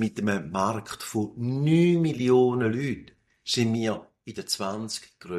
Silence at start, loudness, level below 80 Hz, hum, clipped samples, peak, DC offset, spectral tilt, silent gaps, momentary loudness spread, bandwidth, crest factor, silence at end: 0 s; -26 LUFS; -62 dBFS; none; under 0.1%; -10 dBFS; under 0.1%; -5.5 dB/octave; none; 15 LU; 14.5 kHz; 16 dB; 0 s